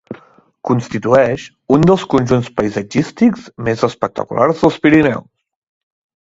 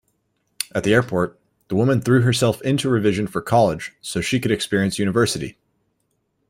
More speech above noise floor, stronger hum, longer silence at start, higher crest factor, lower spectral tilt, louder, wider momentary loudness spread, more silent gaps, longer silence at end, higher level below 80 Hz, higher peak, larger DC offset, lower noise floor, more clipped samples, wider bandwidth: second, 31 dB vs 51 dB; neither; second, 0.1 s vs 0.6 s; about the same, 16 dB vs 20 dB; first, -7 dB/octave vs -5.5 dB/octave; first, -15 LUFS vs -20 LUFS; about the same, 11 LU vs 10 LU; neither; about the same, 1 s vs 1 s; first, -46 dBFS vs -52 dBFS; about the same, 0 dBFS vs 0 dBFS; neither; second, -45 dBFS vs -70 dBFS; neither; second, 8 kHz vs 16.5 kHz